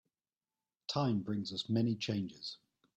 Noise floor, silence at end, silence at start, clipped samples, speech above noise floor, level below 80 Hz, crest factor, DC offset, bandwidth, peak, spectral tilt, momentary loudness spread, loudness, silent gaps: under -90 dBFS; 0.4 s; 0.9 s; under 0.1%; over 54 dB; -74 dBFS; 16 dB; under 0.1%; 8.4 kHz; -22 dBFS; -6 dB/octave; 12 LU; -37 LUFS; none